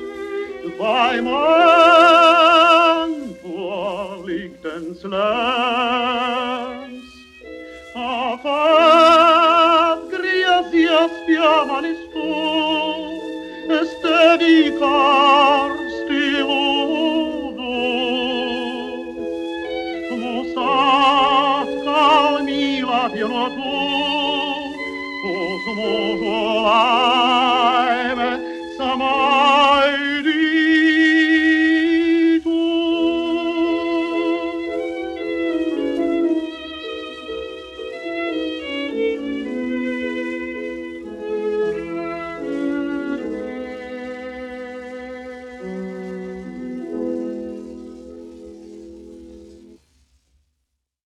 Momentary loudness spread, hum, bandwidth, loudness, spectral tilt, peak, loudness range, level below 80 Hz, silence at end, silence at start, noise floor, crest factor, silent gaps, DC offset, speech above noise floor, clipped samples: 18 LU; none; 10.5 kHz; -17 LUFS; -4 dB/octave; 0 dBFS; 14 LU; -54 dBFS; 1.55 s; 0 s; -75 dBFS; 18 dB; none; under 0.1%; 60 dB; under 0.1%